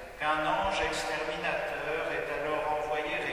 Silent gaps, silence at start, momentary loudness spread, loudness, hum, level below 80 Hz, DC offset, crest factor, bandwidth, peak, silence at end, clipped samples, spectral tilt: none; 0 s; 4 LU; -31 LUFS; none; -52 dBFS; under 0.1%; 16 dB; 15.5 kHz; -16 dBFS; 0 s; under 0.1%; -3.5 dB/octave